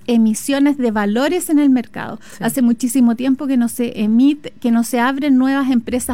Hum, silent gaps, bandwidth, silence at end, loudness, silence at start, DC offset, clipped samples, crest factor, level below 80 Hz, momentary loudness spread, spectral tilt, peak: none; none; 16.5 kHz; 0 s; -16 LUFS; 0.1 s; 0.9%; under 0.1%; 10 dB; -50 dBFS; 6 LU; -4.5 dB/octave; -4 dBFS